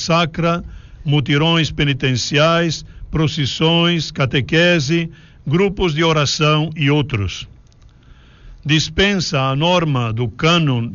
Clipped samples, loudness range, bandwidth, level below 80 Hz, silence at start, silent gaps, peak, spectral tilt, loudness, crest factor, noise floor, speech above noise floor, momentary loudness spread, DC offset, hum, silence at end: under 0.1%; 3 LU; 7.4 kHz; -38 dBFS; 0 s; none; -2 dBFS; -4 dB/octave; -16 LUFS; 16 dB; -46 dBFS; 30 dB; 9 LU; under 0.1%; none; 0 s